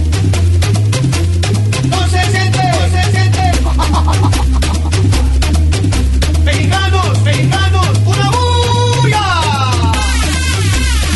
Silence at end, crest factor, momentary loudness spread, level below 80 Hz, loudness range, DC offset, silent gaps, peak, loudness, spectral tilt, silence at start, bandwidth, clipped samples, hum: 0 s; 10 dB; 2 LU; -16 dBFS; 1 LU; under 0.1%; none; 0 dBFS; -12 LUFS; -5 dB/octave; 0 s; 12 kHz; under 0.1%; none